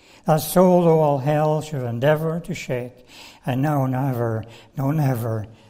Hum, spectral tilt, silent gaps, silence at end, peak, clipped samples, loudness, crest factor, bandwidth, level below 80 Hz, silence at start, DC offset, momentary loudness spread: none; -7 dB/octave; none; 0.15 s; -4 dBFS; under 0.1%; -21 LUFS; 18 dB; 16 kHz; -52 dBFS; 0.25 s; under 0.1%; 12 LU